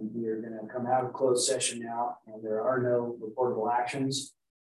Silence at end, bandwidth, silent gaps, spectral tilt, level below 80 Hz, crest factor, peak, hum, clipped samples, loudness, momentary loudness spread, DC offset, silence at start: 0.5 s; 12.5 kHz; none; -3.5 dB/octave; -78 dBFS; 16 dB; -14 dBFS; none; under 0.1%; -30 LUFS; 10 LU; under 0.1%; 0 s